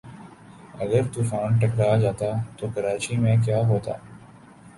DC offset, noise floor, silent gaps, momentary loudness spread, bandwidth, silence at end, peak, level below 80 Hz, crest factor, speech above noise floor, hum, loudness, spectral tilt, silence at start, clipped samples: under 0.1%; -48 dBFS; none; 13 LU; 11.5 kHz; 0.1 s; -8 dBFS; -52 dBFS; 16 dB; 25 dB; none; -24 LUFS; -7 dB/octave; 0.05 s; under 0.1%